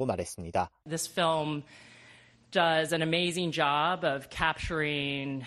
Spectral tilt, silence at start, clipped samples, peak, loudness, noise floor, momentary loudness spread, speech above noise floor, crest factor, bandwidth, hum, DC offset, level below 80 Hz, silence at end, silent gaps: -4 dB/octave; 0 s; under 0.1%; -10 dBFS; -29 LUFS; -57 dBFS; 8 LU; 27 dB; 20 dB; 13 kHz; none; under 0.1%; -54 dBFS; 0 s; none